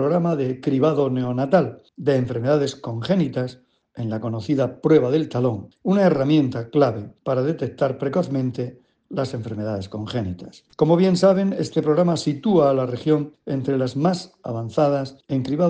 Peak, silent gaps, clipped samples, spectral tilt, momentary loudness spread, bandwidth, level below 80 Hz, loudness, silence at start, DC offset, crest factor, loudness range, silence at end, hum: -4 dBFS; none; under 0.1%; -7.5 dB/octave; 11 LU; 9.4 kHz; -60 dBFS; -22 LUFS; 0 s; under 0.1%; 18 dB; 5 LU; 0 s; none